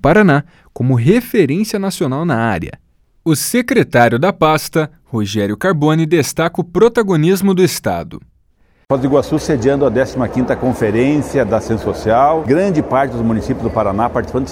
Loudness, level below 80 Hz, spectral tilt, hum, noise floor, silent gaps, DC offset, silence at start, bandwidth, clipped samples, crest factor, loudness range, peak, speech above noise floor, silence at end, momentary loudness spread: -15 LUFS; -38 dBFS; -6 dB/octave; none; -54 dBFS; none; under 0.1%; 0.05 s; 19 kHz; under 0.1%; 14 dB; 2 LU; 0 dBFS; 40 dB; 0 s; 7 LU